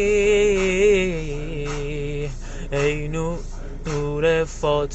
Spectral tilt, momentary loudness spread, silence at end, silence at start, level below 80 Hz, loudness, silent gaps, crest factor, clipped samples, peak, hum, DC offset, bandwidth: -5 dB/octave; 13 LU; 0 s; 0 s; -32 dBFS; -22 LUFS; none; 14 dB; under 0.1%; -8 dBFS; none; under 0.1%; 8.4 kHz